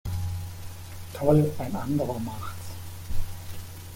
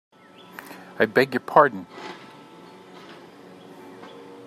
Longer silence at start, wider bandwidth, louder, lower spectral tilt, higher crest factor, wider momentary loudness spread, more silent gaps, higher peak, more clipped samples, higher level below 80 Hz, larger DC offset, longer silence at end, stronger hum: second, 0.05 s vs 0.7 s; first, 17 kHz vs 15 kHz; second, -29 LUFS vs -20 LUFS; first, -7 dB/octave vs -5.5 dB/octave; about the same, 20 dB vs 24 dB; second, 18 LU vs 27 LU; neither; second, -8 dBFS vs -2 dBFS; neither; first, -40 dBFS vs -74 dBFS; neither; second, 0 s vs 0.4 s; neither